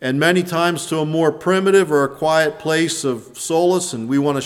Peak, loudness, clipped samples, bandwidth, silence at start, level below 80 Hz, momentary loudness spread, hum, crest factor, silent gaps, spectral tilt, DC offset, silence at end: -2 dBFS; -18 LUFS; under 0.1%; 16.5 kHz; 0 s; -60 dBFS; 7 LU; none; 16 dB; none; -4.5 dB/octave; under 0.1%; 0 s